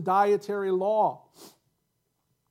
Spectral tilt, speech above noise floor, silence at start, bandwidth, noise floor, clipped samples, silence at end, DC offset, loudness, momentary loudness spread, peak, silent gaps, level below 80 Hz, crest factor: -6.5 dB/octave; 51 dB; 0 s; 15.5 kHz; -76 dBFS; under 0.1%; 1 s; under 0.1%; -26 LUFS; 5 LU; -12 dBFS; none; -86 dBFS; 16 dB